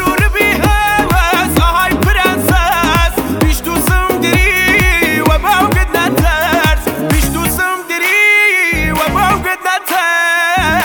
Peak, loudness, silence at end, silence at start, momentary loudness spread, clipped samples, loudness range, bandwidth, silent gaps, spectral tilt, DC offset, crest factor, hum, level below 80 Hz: 0 dBFS; -11 LUFS; 0 s; 0 s; 5 LU; under 0.1%; 1 LU; over 20 kHz; none; -4 dB/octave; under 0.1%; 12 dB; none; -18 dBFS